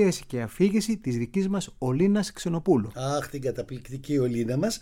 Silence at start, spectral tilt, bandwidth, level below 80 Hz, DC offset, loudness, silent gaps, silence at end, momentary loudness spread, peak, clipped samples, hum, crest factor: 0 s; -6 dB/octave; 16.5 kHz; -52 dBFS; under 0.1%; -27 LUFS; none; 0 s; 8 LU; -10 dBFS; under 0.1%; none; 16 dB